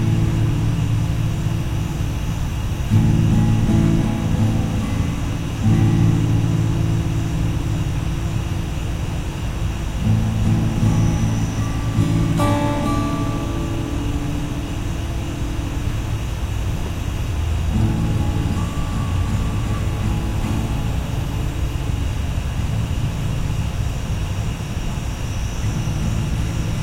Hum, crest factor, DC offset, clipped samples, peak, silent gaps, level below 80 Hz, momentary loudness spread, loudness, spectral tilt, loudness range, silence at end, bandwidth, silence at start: none; 16 dB; under 0.1%; under 0.1%; -4 dBFS; none; -26 dBFS; 8 LU; -21 LUFS; -6.5 dB/octave; 5 LU; 0 s; 16 kHz; 0 s